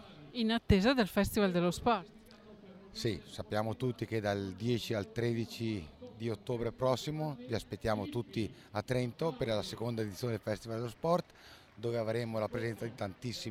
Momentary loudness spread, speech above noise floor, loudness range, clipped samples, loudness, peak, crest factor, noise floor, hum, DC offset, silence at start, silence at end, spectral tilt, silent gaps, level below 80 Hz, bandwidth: 11 LU; 23 dB; 4 LU; under 0.1%; -35 LUFS; -14 dBFS; 20 dB; -57 dBFS; none; under 0.1%; 0 s; 0 s; -6 dB/octave; none; -54 dBFS; 16 kHz